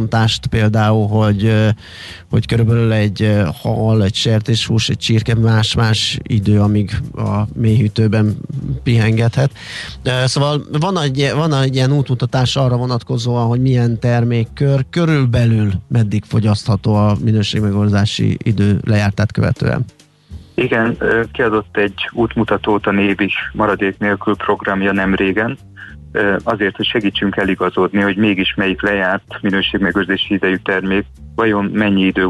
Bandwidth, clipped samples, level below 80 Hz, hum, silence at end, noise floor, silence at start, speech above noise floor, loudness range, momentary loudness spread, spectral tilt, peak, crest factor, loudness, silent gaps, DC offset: 11.5 kHz; under 0.1%; -38 dBFS; none; 0 s; -36 dBFS; 0 s; 22 dB; 2 LU; 5 LU; -6.5 dB/octave; -2 dBFS; 12 dB; -15 LUFS; none; under 0.1%